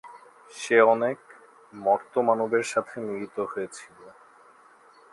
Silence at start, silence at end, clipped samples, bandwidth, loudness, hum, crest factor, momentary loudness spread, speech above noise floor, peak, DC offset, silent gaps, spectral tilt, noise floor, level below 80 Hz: 0.05 s; 1.05 s; under 0.1%; 11.5 kHz; -25 LUFS; none; 22 dB; 18 LU; 30 dB; -6 dBFS; under 0.1%; none; -4.5 dB/octave; -55 dBFS; -76 dBFS